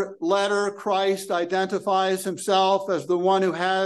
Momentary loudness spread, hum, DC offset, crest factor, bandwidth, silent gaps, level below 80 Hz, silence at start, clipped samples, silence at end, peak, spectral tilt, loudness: 4 LU; none; under 0.1%; 14 dB; 12.5 kHz; none; -76 dBFS; 0 s; under 0.1%; 0 s; -8 dBFS; -4 dB/octave; -23 LUFS